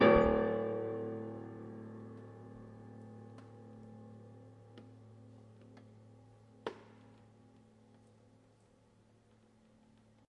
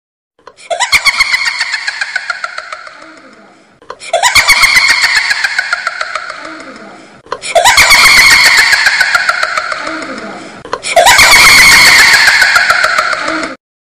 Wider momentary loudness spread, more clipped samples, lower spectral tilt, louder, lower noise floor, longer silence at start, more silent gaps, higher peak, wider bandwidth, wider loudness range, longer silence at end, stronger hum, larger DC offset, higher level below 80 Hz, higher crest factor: first, 25 LU vs 21 LU; second, under 0.1% vs 0.8%; first, -8 dB/octave vs 0.5 dB/octave; second, -36 LUFS vs -5 LUFS; first, -67 dBFS vs -41 dBFS; second, 0 s vs 0.7 s; neither; second, -12 dBFS vs 0 dBFS; second, 7.4 kHz vs over 20 kHz; first, 15 LU vs 9 LU; first, 3.65 s vs 0.25 s; neither; neither; second, -56 dBFS vs -36 dBFS; first, 26 dB vs 10 dB